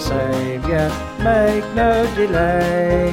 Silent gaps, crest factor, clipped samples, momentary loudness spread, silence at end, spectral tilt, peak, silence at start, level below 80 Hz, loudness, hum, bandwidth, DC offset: none; 14 dB; under 0.1%; 5 LU; 0 s; -6.5 dB/octave; -4 dBFS; 0 s; -30 dBFS; -17 LUFS; none; 16.5 kHz; under 0.1%